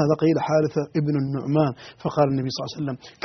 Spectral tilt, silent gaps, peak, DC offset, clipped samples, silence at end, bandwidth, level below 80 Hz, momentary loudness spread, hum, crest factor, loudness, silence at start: -7 dB/octave; none; -6 dBFS; under 0.1%; under 0.1%; 0.15 s; 6.4 kHz; -60 dBFS; 9 LU; none; 16 dB; -24 LUFS; 0 s